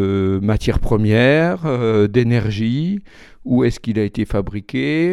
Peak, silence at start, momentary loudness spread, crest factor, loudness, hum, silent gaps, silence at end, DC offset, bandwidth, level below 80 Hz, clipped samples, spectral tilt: -2 dBFS; 0 s; 9 LU; 16 dB; -18 LUFS; none; none; 0 s; under 0.1%; 12 kHz; -32 dBFS; under 0.1%; -7.5 dB/octave